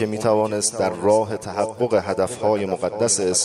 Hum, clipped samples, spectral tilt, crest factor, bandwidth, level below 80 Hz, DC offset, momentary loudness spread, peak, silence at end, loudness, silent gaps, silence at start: none; under 0.1%; -3.5 dB/octave; 16 dB; 13 kHz; -58 dBFS; under 0.1%; 6 LU; -6 dBFS; 0 s; -21 LUFS; none; 0 s